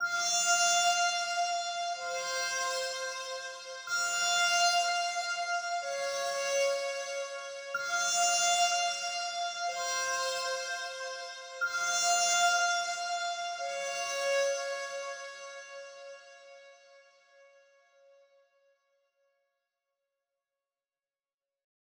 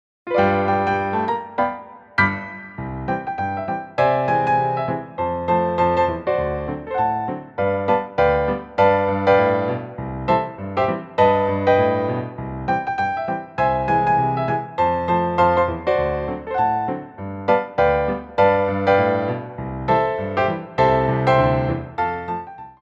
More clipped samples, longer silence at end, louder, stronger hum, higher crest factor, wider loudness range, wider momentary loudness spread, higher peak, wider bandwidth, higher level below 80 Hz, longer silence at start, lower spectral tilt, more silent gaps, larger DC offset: neither; first, 4.95 s vs 0.1 s; second, -30 LUFS vs -20 LUFS; neither; about the same, 18 dB vs 18 dB; first, 7 LU vs 2 LU; first, 15 LU vs 10 LU; second, -16 dBFS vs -2 dBFS; first, over 20 kHz vs 7.4 kHz; second, -88 dBFS vs -42 dBFS; second, 0 s vs 0.25 s; second, 2.5 dB/octave vs -8 dB/octave; neither; neither